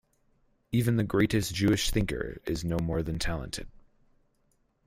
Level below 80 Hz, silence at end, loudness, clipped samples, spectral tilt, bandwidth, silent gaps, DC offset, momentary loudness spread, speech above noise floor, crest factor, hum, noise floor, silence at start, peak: -42 dBFS; 1.15 s; -29 LUFS; under 0.1%; -5.5 dB/octave; 16 kHz; none; under 0.1%; 9 LU; 43 dB; 18 dB; none; -71 dBFS; 0.7 s; -12 dBFS